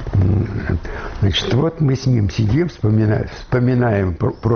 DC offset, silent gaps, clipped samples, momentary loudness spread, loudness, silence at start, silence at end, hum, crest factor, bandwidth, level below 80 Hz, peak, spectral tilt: under 0.1%; none; under 0.1%; 6 LU; -18 LUFS; 0 s; 0 s; none; 10 dB; 6.6 kHz; -32 dBFS; -6 dBFS; -6.5 dB/octave